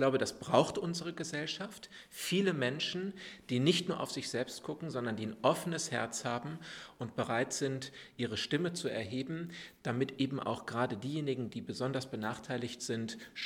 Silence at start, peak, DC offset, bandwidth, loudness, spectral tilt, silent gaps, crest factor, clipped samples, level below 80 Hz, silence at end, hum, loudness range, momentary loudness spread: 0 s; -10 dBFS; under 0.1%; 19 kHz; -36 LUFS; -4.5 dB/octave; none; 26 dB; under 0.1%; -72 dBFS; 0 s; none; 3 LU; 11 LU